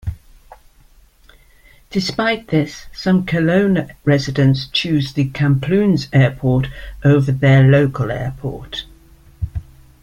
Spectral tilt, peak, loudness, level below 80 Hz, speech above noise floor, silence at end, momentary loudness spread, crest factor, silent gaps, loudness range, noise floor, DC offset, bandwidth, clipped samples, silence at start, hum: -7 dB/octave; -2 dBFS; -17 LUFS; -38 dBFS; 34 dB; 0.4 s; 15 LU; 16 dB; none; 5 LU; -49 dBFS; under 0.1%; 7.4 kHz; under 0.1%; 0.05 s; none